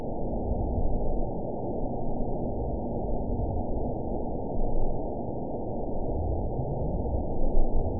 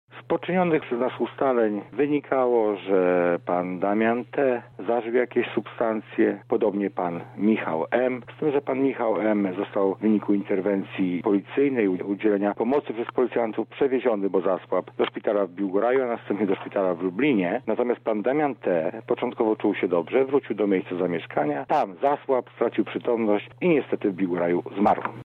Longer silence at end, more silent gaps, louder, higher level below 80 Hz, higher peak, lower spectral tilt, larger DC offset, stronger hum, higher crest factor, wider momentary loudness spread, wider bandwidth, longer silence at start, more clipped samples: about the same, 0 s vs 0 s; neither; second, -32 LUFS vs -24 LUFS; first, -30 dBFS vs -70 dBFS; about the same, -10 dBFS vs -8 dBFS; first, -17.5 dB/octave vs -9 dB/octave; first, 2% vs under 0.1%; neither; about the same, 18 dB vs 16 dB; about the same, 3 LU vs 4 LU; second, 1 kHz vs 4.7 kHz; second, 0 s vs 0.15 s; neither